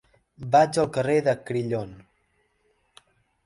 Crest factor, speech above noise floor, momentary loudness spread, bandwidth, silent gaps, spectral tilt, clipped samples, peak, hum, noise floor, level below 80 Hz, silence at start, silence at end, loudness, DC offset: 20 dB; 46 dB; 14 LU; 11.5 kHz; none; -6 dB/octave; under 0.1%; -6 dBFS; none; -69 dBFS; -60 dBFS; 0.4 s; 1.45 s; -23 LUFS; under 0.1%